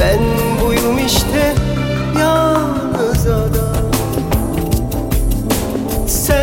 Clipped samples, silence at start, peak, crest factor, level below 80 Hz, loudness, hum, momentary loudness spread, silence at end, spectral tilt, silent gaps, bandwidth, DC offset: under 0.1%; 0 s; 0 dBFS; 14 dB; -22 dBFS; -16 LUFS; none; 4 LU; 0 s; -5 dB/octave; none; 17 kHz; under 0.1%